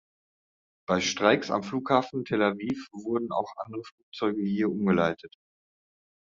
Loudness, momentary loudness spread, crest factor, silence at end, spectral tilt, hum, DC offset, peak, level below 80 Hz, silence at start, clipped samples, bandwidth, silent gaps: -28 LUFS; 14 LU; 24 dB; 1.1 s; -4 dB/octave; none; under 0.1%; -6 dBFS; -68 dBFS; 0.9 s; under 0.1%; 7.6 kHz; 3.92-4.12 s